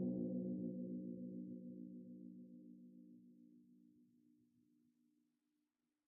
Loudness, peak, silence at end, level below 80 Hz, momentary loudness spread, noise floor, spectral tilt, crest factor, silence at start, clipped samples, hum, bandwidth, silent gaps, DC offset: -49 LUFS; -34 dBFS; 2 s; under -90 dBFS; 22 LU; -90 dBFS; -4 dB/octave; 18 dB; 0 s; under 0.1%; none; 1 kHz; none; under 0.1%